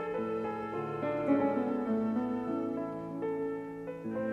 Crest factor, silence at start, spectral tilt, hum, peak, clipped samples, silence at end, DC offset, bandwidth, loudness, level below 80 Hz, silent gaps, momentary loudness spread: 16 dB; 0 s; -9 dB/octave; none; -16 dBFS; under 0.1%; 0 s; under 0.1%; 7.4 kHz; -34 LUFS; -66 dBFS; none; 9 LU